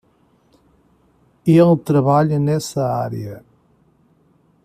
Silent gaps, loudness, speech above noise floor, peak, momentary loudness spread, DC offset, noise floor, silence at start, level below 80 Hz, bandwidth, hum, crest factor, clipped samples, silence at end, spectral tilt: none; -17 LUFS; 42 dB; -2 dBFS; 16 LU; under 0.1%; -58 dBFS; 1.45 s; -56 dBFS; 14.5 kHz; none; 16 dB; under 0.1%; 1.25 s; -8 dB/octave